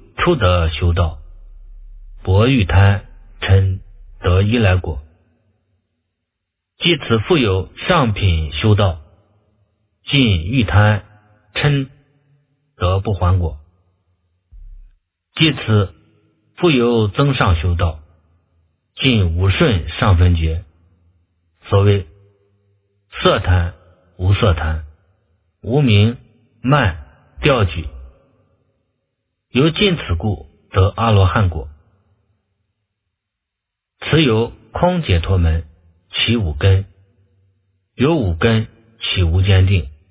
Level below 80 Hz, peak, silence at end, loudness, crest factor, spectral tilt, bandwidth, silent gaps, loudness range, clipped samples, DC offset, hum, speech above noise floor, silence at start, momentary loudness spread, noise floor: -26 dBFS; 0 dBFS; 0.2 s; -16 LUFS; 18 dB; -11 dB/octave; 4 kHz; none; 4 LU; under 0.1%; under 0.1%; none; 66 dB; 0.2 s; 12 LU; -81 dBFS